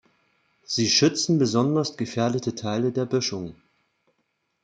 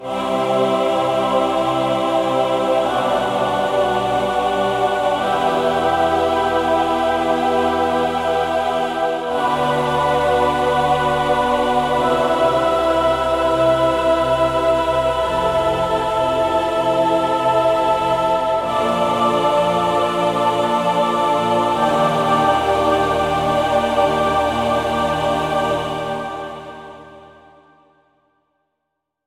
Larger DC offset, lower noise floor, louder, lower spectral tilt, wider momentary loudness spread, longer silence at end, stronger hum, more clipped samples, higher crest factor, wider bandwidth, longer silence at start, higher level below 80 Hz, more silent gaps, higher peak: second, under 0.1% vs 0.1%; about the same, -74 dBFS vs -77 dBFS; second, -23 LUFS vs -17 LUFS; about the same, -4.5 dB/octave vs -5 dB/octave; first, 10 LU vs 3 LU; second, 1.1 s vs 2 s; neither; neither; about the same, 18 dB vs 14 dB; second, 9.4 kHz vs 16 kHz; first, 0.7 s vs 0 s; second, -66 dBFS vs -42 dBFS; neither; about the same, -6 dBFS vs -4 dBFS